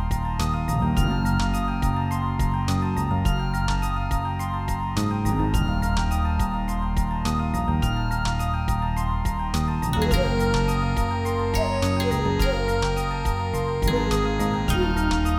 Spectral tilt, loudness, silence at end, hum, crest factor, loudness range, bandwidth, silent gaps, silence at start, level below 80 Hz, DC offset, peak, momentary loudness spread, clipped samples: -6 dB/octave; -24 LUFS; 0 s; none; 16 dB; 2 LU; 19 kHz; none; 0 s; -28 dBFS; under 0.1%; -6 dBFS; 4 LU; under 0.1%